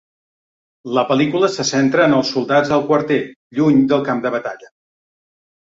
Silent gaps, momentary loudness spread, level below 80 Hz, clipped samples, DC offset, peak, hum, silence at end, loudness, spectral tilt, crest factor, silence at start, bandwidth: 3.36-3.50 s; 10 LU; -58 dBFS; under 0.1%; under 0.1%; -2 dBFS; none; 1 s; -16 LUFS; -5 dB/octave; 16 dB; 0.85 s; 7.8 kHz